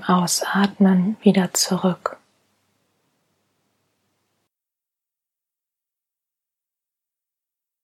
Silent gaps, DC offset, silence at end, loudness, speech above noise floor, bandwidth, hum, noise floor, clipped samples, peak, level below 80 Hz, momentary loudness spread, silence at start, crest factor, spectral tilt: none; under 0.1%; 5.7 s; -19 LUFS; 68 dB; 15.5 kHz; none; -87 dBFS; under 0.1%; -2 dBFS; -72 dBFS; 6 LU; 0 s; 22 dB; -4.5 dB/octave